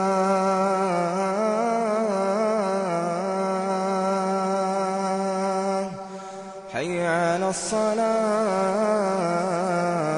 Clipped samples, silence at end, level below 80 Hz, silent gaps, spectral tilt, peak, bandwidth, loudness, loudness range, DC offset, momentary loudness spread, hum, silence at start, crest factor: under 0.1%; 0 s; -66 dBFS; none; -5.5 dB/octave; -10 dBFS; 11 kHz; -24 LUFS; 3 LU; under 0.1%; 5 LU; none; 0 s; 12 dB